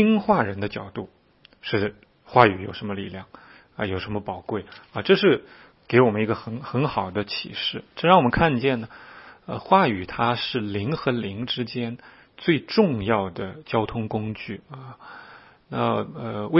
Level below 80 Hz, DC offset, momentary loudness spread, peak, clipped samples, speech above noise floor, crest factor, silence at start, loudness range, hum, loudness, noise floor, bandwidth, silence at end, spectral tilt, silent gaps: -52 dBFS; under 0.1%; 19 LU; 0 dBFS; under 0.1%; 25 dB; 24 dB; 0 s; 4 LU; none; -24 LUFS; -48 dBFS; 5.8 kHz; 0 s; -10 dB/octave; none